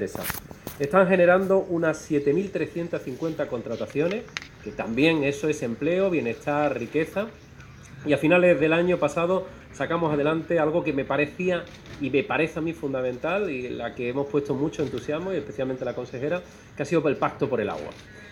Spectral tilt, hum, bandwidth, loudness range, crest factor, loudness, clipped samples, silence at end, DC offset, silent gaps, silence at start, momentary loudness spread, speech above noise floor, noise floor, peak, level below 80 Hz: -6 dB/octave; none; 17 kHz; 5 LU; 20 dB; -25 LUFS; under 0.1%; 0 s; under 0.1%; none; 0 s; 12 LU; 20 dB; -45 dBFS; -4 dBFS; -54 dBFS